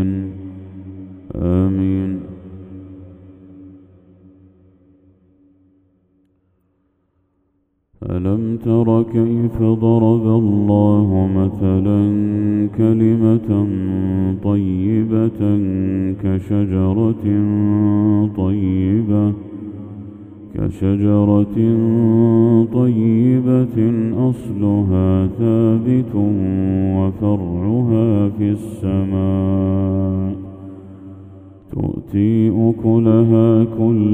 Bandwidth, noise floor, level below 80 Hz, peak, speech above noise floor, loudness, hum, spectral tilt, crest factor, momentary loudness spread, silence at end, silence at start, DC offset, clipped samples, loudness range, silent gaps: 3.7 kHz; -65 dBFS; -44 dBFS; 0 dBFS; 50 dB; -16 LUFS; none; -11 dB/octave; 16 dB; 17 LU; 0 s; 0 s; under 0.1%; under 0.1%; 8 LU; none